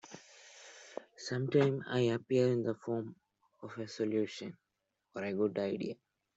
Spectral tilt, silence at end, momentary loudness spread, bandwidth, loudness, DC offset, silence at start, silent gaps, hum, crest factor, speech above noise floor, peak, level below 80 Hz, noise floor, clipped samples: -6.5 dB/octave; 0.45 s; 22 LU; 8 kHz; -35 LUFS; under 0.1%; 0.05 s; none; none; 20 dB; 50 dB; -16 dBFS; -76 dBFS; -84 dBFS; under 0.1%